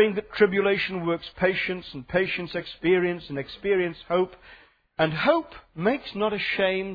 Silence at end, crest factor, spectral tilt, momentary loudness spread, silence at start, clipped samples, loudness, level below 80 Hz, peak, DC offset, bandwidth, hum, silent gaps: 0 s; 18 dB; -8 dB/octave; 9 LU; 0 s; under 0.1%; -25 LUFS; -56 dBFS; -6 dBFS; under 0.1%; 5 kHz; none; none